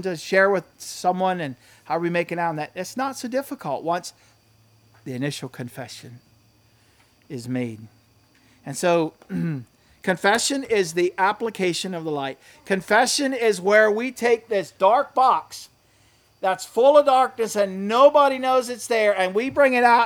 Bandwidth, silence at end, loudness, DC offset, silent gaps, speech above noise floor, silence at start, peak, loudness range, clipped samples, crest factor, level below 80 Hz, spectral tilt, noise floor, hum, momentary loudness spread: 19 kHz; 0 s; -21 LUFS; under 0.1%; none; 37 dB; 0 s; -2 dBFS; 14 LU; under 0.1%; 20 dB; -66 dBFS; -4 dB/octave; -58 dBFS; none; 18 LU